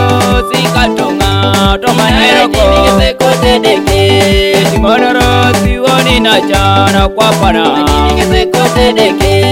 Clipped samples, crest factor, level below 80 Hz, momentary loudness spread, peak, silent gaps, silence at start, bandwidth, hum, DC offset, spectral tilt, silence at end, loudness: 0.9%; 8 dB; -18 dBFS; 3 LU; 0 dBFS; none; 0 s; 17 kHz; none; under 0.1%; -4.5 dB/octave; 0 s; -8 LUFS